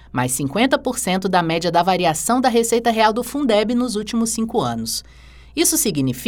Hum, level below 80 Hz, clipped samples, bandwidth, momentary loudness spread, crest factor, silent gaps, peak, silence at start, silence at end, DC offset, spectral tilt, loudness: none; -46 dBFS; under 0.1%; over 20 kHz; 5 LU; 18 dB; none; -2 dBFS; 0.15 s; 0 s; under 0.1%; -3.5 dB/octave; -18 LUFS